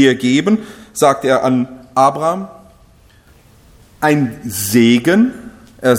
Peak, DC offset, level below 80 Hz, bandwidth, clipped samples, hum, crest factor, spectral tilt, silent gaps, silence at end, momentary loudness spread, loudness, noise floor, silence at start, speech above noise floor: 0 dBFS; under 0.1%; -50 dBFS; 17 kHz; under 0.1%; none; 14 dB; -5 dB/octave; none; 0 s; 9 LU; -14 LUFS; -47 dBFS; 0 s; 34 dB